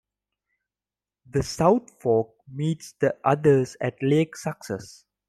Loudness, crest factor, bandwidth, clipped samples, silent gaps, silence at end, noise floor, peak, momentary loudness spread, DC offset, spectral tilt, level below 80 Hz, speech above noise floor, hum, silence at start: -24 LUFS; 20 dB; 13.5 kHz; under 0.1%; none; 0.4 s; under -90 dBFS; -6 dBFS; 13 LU; under 0.1%; -6.5 dB/octave; -54 dBFS; over 67 dB; 50 Hz at -60 dBFS; 1.35 s